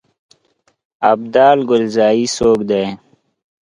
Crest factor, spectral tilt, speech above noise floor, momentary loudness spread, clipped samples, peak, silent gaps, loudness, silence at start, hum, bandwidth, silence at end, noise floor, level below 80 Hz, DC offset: 16 dB; -4.5 dB/octave; 48 dB; 8 LU; under 0.1%; 0 dBFS; none; -14 LUFS; 1 s; none; 11.5 kHz; 0.65 s; -61 dBFS; -50 dBFS; under 0.1%